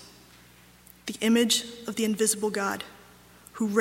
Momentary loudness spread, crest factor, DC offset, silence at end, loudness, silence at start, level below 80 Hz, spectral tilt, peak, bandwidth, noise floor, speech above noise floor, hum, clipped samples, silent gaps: 17 LU; 20 dB; under 0.1%; 0 s; -26 LUFS; 0 s; -66 dBFS; -3 dB/octave; -10 dBFS; 16.5 kHz; -54 dBFS; 28 dB; 60 Hz at -60 dBFS; under 0.1%; none